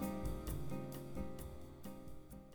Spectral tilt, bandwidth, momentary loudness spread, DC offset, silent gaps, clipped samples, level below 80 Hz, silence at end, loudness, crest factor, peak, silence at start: -6.5 dB/octave; over 20 kHz; 10 LU; under 0.1%; none; under 0.1%; -52 dBFS; 0 s; -48 LUFS; 14 dB; -30 dBFS; 0 s